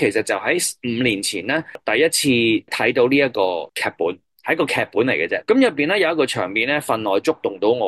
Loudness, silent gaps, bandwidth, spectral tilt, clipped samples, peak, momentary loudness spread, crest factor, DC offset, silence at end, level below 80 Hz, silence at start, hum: -19 LUFS; none; 13 kHz; -3.5 dB/octave; under 0.1%; -4 dBFS; 7 LU; 16 dB; under 0.1%; 0 s; -62 dBFS; 0 s; none